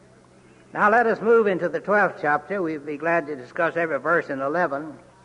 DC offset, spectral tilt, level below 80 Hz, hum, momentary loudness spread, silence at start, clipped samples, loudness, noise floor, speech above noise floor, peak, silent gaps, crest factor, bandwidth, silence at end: under 0.1%; -7 dB/octave; -66 dBFS; none; 9 LU; 0.75 s; under 0.1%; -22 LUFS; -52 dBFS; 30 dB; -8 dBFS; none; 16 dB; 10 kHz; 0.25 s